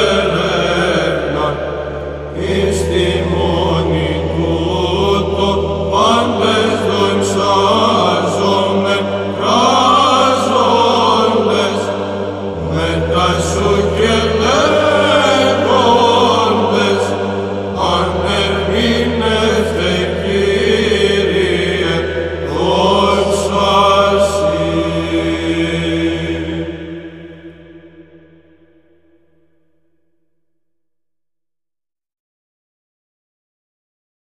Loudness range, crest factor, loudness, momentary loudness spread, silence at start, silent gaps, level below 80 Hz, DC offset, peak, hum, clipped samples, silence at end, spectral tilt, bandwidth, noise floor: 5 LU; 14 dB; -13 LUFS; 9 LU; 0 s; none; -32 dBFS; 0.2%; 0 dBFS; none; under 0.1%; 6.2 s; -5 dB/octave; 13.5 kHz; -83 dBFS